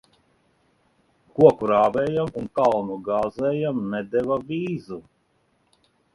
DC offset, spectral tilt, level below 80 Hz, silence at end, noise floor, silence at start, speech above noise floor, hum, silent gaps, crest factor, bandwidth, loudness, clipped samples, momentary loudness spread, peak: under 0.1%; -8 dB/octave; -58 dBFS; 1.15 s; -67 dBFS; 1.35 s; 45 dB; none; none; 22 dB; 11 kHz; -22 LUFS; under 0.1%; 13 LU; -2 dBFS